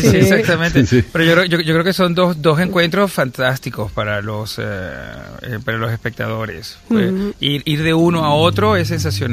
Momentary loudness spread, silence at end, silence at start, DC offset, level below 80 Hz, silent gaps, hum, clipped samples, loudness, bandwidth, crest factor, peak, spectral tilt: 12 LU; 0 s; 0 s; under 0.1%; -38 dBFS; none; none; under 0.1%; -16 LUFS; 15.5 kHz; 16 dB; 0 dBFS; -5.5 dB/octave